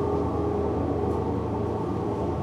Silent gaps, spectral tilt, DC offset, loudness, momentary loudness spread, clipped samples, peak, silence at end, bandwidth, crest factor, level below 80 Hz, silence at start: none; -9.5 dB/octave; under 0.1%; -27 LUFS; 2 LU; under 0.1%; -14 dBFS; 0 s; 10.5 kHz; 12 dB; -40 dBFS; 0 s